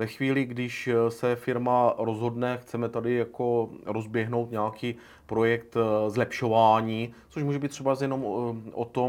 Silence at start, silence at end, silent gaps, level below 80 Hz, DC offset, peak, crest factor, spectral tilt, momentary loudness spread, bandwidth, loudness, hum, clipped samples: 0 s; 0 s; none; -64 dBFS; under 0.1%; -8 dBFS; 18 dB; -7 dB/octave; 9 LU; 17.5 kHz; -27 LUFS; none; under 0.1%